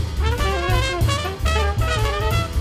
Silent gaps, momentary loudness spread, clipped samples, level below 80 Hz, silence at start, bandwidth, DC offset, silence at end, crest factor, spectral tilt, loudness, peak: none; 2 LU; under 0.1%; -24 dBFS; 0 s; 15.5 kHz; under 0.1%; 0 s; 14 dB; -5 dB/octave; -21 LUFS; -6 dBFS